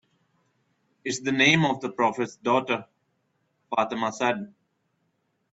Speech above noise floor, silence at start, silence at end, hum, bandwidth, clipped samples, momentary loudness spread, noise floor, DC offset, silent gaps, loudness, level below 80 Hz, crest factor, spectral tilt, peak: 49 dB; 1.05 s; 1.05 s; none; 8.2 kHz; under 0.1%; 13 LU; -73 dBFS; under 0.1%; none; -25 LUFS; -70 dBFS; 22 dB; -4.5 dB/octave; -6 dBFS